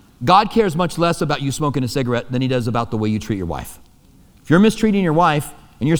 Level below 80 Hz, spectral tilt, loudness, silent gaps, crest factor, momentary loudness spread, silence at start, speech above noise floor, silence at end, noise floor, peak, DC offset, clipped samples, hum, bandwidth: -42 dBFS; -6 dB/octave; -18 LUFS; none; 18 dB; 10 LU; 0.2 s; 32 dB; 0 s; -49 dBFS; 0 dBFS; under 0.1%; under 0.1%; none; over 20 kHz